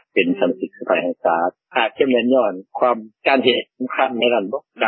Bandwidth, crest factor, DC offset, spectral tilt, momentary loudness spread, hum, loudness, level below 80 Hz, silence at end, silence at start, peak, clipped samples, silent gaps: 4.5 kHz; 18 dB; under 0.1%; -9.5 dB/octave; 6 LU; none; -19 LUFS; -70 dBFS; 0 s; 0.15 s; -2 dBFS; under 0.1%; none